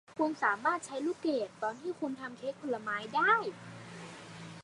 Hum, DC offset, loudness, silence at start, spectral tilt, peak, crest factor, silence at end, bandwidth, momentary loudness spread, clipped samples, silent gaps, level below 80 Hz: none; under 0.1%; -33 LUFS; 0.1 s; -4.5 dB/octave; -14 dBFS; 20 dB; 0 s; 11.5 kHz; 19 LU; under 0.1%; none; -80 dBFS